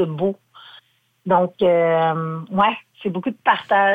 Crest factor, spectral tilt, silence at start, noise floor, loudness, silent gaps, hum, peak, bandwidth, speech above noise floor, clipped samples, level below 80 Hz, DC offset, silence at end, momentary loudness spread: 16 dB; -8 dB/octave; 0 s; -52 dBFS; -20 LUFS; none; none; -4 dBFS; 4.9 kHz; 33 dB; under 0.1%; -64 dBFS; under 0.1%; 0 s; 11 LU